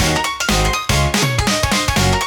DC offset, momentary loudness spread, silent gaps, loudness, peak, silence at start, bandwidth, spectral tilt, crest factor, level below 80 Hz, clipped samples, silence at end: under 0.1%; 2 LU; none; -16 LUFS; -2 dBFS; 0 s; 18 kHz; -3.5 dB/octave; 14 dB; -26 dBFS; under 0.1%; 0 s